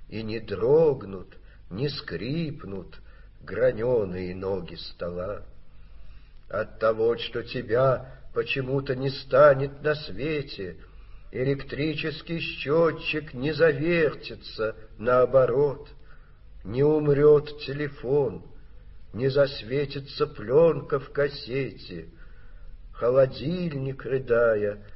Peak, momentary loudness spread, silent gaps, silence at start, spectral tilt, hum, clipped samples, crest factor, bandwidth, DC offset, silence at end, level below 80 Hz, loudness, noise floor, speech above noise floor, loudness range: -6 dBFS; 15 LU; none; 0 s; -5 dB/octave; none; under 0.1%; 20 dB; 5.8 kHz; under 0.1%; 0 s; -48 dBFS; -25 LUFS; -46 dBFS; 21 dB; 6 LU